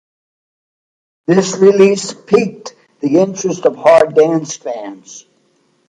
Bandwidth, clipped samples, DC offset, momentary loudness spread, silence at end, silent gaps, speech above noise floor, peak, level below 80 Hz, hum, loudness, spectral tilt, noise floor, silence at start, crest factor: 9.8 kHz; under 0.1%; under 0.1%; 17 LU; 0.75 s; none; 45 dB; 0 dBFS; -60 dBFS; none; -13 LUFS; -5.5 dB/octave; -58 dBFS; 1.3 s; 14 dB